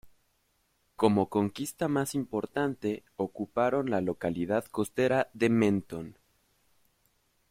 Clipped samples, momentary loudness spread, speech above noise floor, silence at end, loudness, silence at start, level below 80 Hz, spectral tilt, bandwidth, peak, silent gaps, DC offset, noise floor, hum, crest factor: under 0.1%; 9 LU; 44 dB; 1.4 s; -30 LUFS; 0.05 s; -64 dBFS; -6 dB/octave; 16 kHz; -10 dBFS; none; under 0.1%; -73 dBFS; none; 20 dB